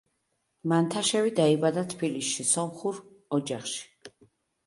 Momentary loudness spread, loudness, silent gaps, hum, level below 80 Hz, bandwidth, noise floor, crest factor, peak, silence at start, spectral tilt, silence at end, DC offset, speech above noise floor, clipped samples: 12 LU; -27 LUFS; none; none; -72 dBFS; 11.5 kHz; -77 dBFS; 18 dB; -10 dBFS; 0.65 s; -4 dB/octave; 0.6 s; under 0.1%; 50 dB; under 0.1%